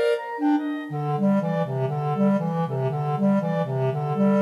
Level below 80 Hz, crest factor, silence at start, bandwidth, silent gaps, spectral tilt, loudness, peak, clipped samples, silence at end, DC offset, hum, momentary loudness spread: -72 dBFS; 10 dB; 0 s; 11 kHz; none; -9 dB/octave; -24 LUFS; -12 dBFS; under 0.1%; 0 s; under 0.1%; none; 4 LU